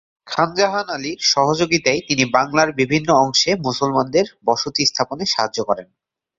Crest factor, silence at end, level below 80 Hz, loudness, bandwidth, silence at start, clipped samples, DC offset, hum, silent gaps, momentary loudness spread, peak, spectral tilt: 18 dB; 0.55 s; -54 dBFS; -18 LUFS; 7.8 kHz; 0.25 s; under 0.1%; under 0.1%; none; none; 6 LU; -2 dBFS; -3.5 dB/octave